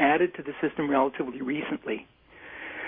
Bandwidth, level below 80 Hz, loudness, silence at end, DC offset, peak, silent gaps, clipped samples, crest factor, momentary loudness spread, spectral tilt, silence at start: 3.8 kHz; -64 dBFS; -29 LUFS; 0 s; under 0.1%; -10 dBFS; none; under 0.1%; 18 dB; 15 LU; -9.5 dB/octave; 0 s